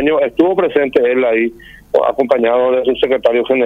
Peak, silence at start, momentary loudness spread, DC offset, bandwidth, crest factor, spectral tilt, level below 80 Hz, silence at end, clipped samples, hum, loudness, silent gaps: 0 dBFS; 0 s; 3 LU; under 0.1%; 5.4 kHz; 12 dB; -6.5 dB/octave; -48 dBFS; 0 s; under 0.1%; none; -14 LUFS; none